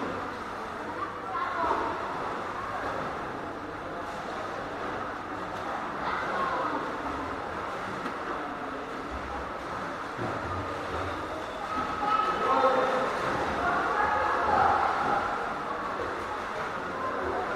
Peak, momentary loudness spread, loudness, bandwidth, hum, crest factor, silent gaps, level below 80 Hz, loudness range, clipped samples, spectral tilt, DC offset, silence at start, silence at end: -12 dBFS; 10 LU; -30 LUFS; 15.5 kHz; none; 20 dB; none; -54 dBFS; 8 LU; under 0.1%; -5 dB/octave; under 0.1%; 0 s; 0 s